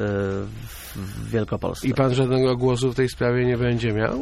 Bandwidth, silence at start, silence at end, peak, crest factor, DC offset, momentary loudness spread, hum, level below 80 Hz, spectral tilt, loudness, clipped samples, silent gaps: 15.5 kHz; 0 s; 0 s; -6 dBFS; 16 dB; under 0.1%; 14 LU; none; -42 dBFS; -6.5 dB/octave; -23 LUFS; under 0.1%; none